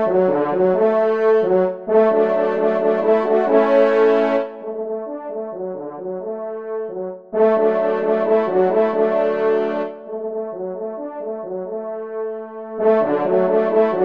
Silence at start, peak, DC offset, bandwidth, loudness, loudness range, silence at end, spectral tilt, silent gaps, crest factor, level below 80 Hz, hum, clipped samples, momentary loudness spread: 0 s; -2 dBFS; 0.2%; 5.2 kHz; -19 LUFS; 8 LU; 0 s; -8.5 dB/octave; none; 16 dB; -68 dBFS; none; under 0.1%; 13 LU